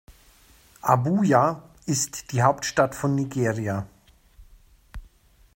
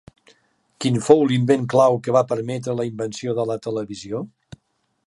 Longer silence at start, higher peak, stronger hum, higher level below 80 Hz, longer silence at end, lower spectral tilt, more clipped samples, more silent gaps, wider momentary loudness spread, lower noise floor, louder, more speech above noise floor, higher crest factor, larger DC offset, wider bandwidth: second, 0.1 s vs 0.8 s; second, -4 dBFS vs 0 dBFS; neither; first, -52 dBFS vs -62 dBFS; second, 0.5 s vs 0.8 s; about the same, -5.5 dB/octave vs -6.5 dB/octave; neither; neither; second, 10 LU vs 14 LU; second, -56 dBFS vs -70 dBFS; second, -24 LUFS vs -21 LUFS; second, 34 dB vs 50 dB; about the same, 22 dB vs 20 dB; neither; first, 16.5 kHz vs 11.5 kHz